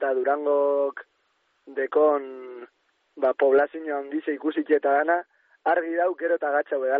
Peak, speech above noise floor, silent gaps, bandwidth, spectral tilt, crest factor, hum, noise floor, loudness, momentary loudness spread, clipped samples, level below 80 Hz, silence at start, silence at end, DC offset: -10 dBFS; 46 dB; none; 4.2 kHz; -1.5 dB/octave; 14 dB; none; -70 dBFS; -24 LUFS; 12 LU; under 0.1%; -78 dBFS; 0 s; 0 s; under 0.1%